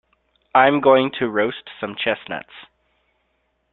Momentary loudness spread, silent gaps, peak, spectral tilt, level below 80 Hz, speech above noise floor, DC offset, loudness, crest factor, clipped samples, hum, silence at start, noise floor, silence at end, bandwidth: 16 LU; none; -2 dBFS; -9.5 dB/octave; -64 dBFS; 50 dB; under 0.1%; -19 LUFS; 20 dB; under 0.1%; none; 0.55 s; -69 dBFS; 1.1 s; 4.2 kHz